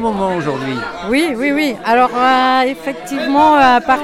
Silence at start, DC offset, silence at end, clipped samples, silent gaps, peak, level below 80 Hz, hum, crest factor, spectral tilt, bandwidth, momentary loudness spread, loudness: 0 s; under 0.1%; 0 s; under 0.1%; none; -2 dBFS; -46 dBFS; none; 12 dB; -5 dB/octave; 15.5 kHz; 11 LU; -14 LUFS